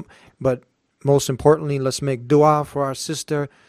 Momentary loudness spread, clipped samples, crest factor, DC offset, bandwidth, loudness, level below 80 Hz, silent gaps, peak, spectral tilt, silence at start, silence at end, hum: 10 LU; under 0.1%; 20 dB; under 0.1%; 15.5 kHz; -20 LUFS; -52 dBFS; none; 0 dBFS; -6 dB/octave; 0 s; 0.2 s; none